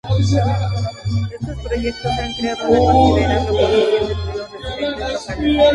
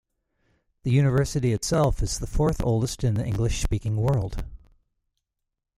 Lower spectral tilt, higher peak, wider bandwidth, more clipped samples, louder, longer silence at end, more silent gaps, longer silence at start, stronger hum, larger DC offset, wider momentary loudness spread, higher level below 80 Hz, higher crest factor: about the same, -6.5 dB/octave vs -6 dB/octave; first, 0 dBFS vs -10 dBFS; second, 11 kHz vs 15 kHz; neither; first, -18 LUFS vs -25 LUFS; second, 0 s vs 1.2 s; neither; second, 0.05 s vs 0.85 s; neither; neither; first, 11 LU vs 7 LU; first, -28 dBFS vs -34 dBFS; about the same, 16 dB vs 16 dB